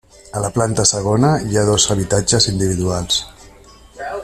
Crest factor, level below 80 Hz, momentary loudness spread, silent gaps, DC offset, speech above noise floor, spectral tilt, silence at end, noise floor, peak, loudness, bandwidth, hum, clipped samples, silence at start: 18 dB; -40 dBFS; 12 LU; none; under 0.1%; 27 dB; -4 dB/octave; 0 s; -43 dBFS; 0 dBFS; -16 LUFS; 13.5 kHz; none; under 0.1%; 0.35 s